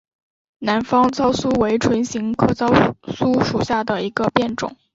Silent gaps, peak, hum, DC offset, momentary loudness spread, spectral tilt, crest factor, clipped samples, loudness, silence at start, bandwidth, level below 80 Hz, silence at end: none; 0 dBFS; none; under 0.1%; 7 LU; -5.5 dB/octave; 18 dB; under 0.1%; -19 LUFS; 0.6 s; 7.8 kHz; -46 dBFS; 0.2 s